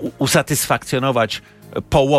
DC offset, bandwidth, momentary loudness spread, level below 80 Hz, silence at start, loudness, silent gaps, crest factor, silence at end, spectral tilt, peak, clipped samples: under 0.1%; 16 kHz; 13 LU; -40 dBFS; 0 s; -18 LUFS; none; 14 dB; 0 s; -4 dB/octave; -4 dBFS; under 0.1%